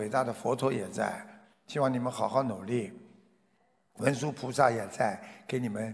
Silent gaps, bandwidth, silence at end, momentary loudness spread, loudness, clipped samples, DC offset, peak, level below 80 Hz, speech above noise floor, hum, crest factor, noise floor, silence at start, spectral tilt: none; 11 kHz; 0 s; 10 LU; -31 LUFS; under 0.1%; under 0.1%; -10 dBFS; -72 dBFS; 41 dB; none; 22 dB; -71 dBFS; 0 s; -6 dB/octave